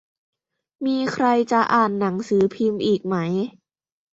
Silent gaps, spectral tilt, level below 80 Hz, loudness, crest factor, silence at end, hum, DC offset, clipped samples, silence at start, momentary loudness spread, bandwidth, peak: none; -6.5 dB/octave; -64 dBFS; -21 LUFS; 18 dB; 0.65 s; none; under 0.1%; under 0.1%; 0.8 s; 7 LU; 8 kHz; -4 dBFS